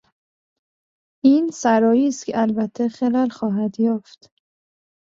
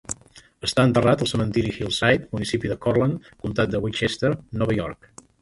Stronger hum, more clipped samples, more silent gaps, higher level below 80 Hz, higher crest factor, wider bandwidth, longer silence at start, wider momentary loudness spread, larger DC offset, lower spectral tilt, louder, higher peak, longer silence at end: neither; neither; neither; second, -66 dBFS vs -46 dBFS; about the same, 18 dB vs 20 dB; second, 7.8 kHz vs 11.5 kHz; first, 1.25 s vs 0.1 s; second, 7 LU vs 10 LU; neither; about the same, -6 dB/octave vs -5.5 dB/octave; first, -20 LUFS vs -23 LUFS; about the same, -4 dBFS vs -4 dBFS; first, 1.05 s vs 0.5 s